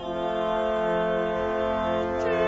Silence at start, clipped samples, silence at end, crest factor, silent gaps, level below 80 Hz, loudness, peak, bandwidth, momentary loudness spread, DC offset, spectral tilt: 0 s; under 0.1%; 0 s; 12 dB; none; -46 dBFS; -26 LUFS; -12 dBFS; 7.8 kHz; 2 LU; under 0.1%; -6.5 dB/octave